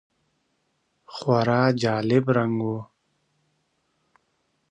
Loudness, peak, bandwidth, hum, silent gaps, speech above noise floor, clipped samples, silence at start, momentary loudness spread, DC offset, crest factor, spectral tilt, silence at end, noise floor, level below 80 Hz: -23 LUFS; -6 dBFS; 9.6 kHz; none; none; 50 dB; under 0.1%; 1.1 s; 11 LU; under 0.1%; 20 dB; -7 dB/octave; 1.85 s; -72 dBFS; -64 dBFS